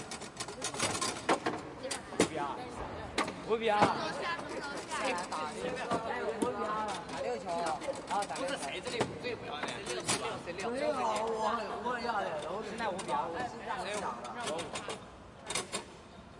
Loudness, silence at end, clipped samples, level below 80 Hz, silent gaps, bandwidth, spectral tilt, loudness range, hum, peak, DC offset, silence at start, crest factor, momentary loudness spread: -35 LUFS; 0 s; under 0.1%; -62 dBFS; none; 11.5 kHz; -3 dB/octave; 3 LU; none; -12 dBFS; under 0.1%; 0 s; 24 dB; 7 LU